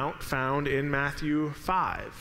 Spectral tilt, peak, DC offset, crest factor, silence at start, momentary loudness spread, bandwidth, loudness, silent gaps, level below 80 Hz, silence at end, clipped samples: -6 dB/octave; -12 dBFS; under 0.1%; 16 dB; 0 s; 3 LU; 16 kHz; -29 LUFS; none; -46 dBFS; 0 s; under 0.1%